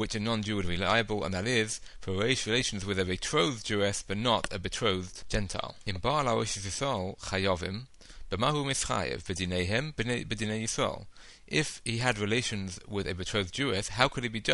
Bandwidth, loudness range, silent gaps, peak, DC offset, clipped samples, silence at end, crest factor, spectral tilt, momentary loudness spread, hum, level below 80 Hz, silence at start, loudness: 11.5 kHz; 2 LU; none; -6 dBFS; under 0.1%; under 0.1%; 0 s; 26 dB; -4 dB/octave; 7 LU; none; -48 dBFS; 0 s; -30 LUFS